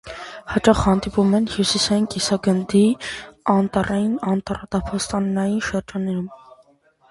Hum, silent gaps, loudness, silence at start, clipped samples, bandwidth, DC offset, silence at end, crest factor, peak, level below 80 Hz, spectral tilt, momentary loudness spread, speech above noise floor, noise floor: none; none; -20 LUFS; 0.05 s; under 0.1%; 11.5 kHz; under 0.1%; 0.75 s; 20 dB; 0 dBFS; -42 dBFS; -5 dB/octave; 9 LU; 37 dB; -56 dBFS